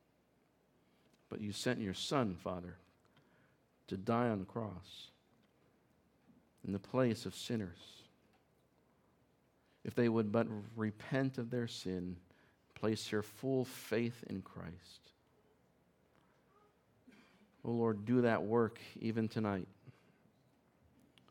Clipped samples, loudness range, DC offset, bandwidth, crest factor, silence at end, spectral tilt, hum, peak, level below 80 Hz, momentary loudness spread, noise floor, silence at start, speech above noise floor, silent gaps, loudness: under 0.1%; 6 LU; under 0.1%; 17.5 kHz; 22 dB; 1.4 s; -6 dB/octave; none; -18 dBFS; -80 dBFS; 17 LU; -74 dBFS; 1.3 s; 36 dB; none; -38 LUFS